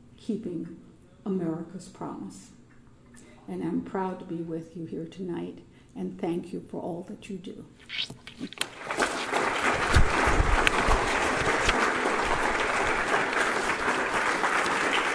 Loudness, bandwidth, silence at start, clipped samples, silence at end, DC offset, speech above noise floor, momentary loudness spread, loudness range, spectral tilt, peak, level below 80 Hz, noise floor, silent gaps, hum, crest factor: -27 LUFS; 11 kHz; 0.1 s; under 0.1%; 0 s; under 0.1%; 19 dB; 16 LU; 12 LU; -4 dB/octave; 0 dBFS; -38 dBFS; -53 dBFS; none; none; 28 dB